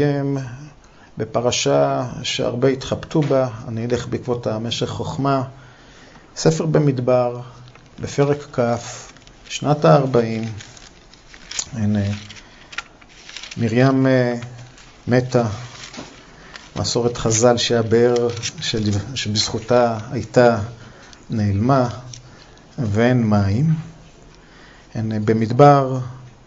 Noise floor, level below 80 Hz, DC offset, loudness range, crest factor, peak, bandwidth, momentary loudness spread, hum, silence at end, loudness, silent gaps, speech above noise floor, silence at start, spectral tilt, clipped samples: -45 dBFS; -48 dBFS; under 0.1%; 4 LU; 20 dB; 0 dBFS; 8 kHz; 19 LU; none; 0.15 s; -19 LUFS; none; 27 dB; 0 s; -5.5 dB/octave; under 0.1%